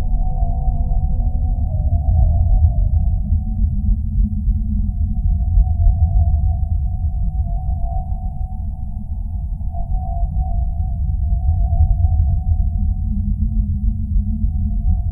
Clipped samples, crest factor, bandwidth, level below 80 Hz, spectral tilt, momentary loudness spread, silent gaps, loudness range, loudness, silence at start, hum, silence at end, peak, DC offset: under 0.1%; 14 dB; 0.9 kHz; -18 dBFS; -15 dB/octave; 9 LU; none; 6 LU; -20 LUFS; 0 s; none; 0 s; -2 dBFS; under 0.1%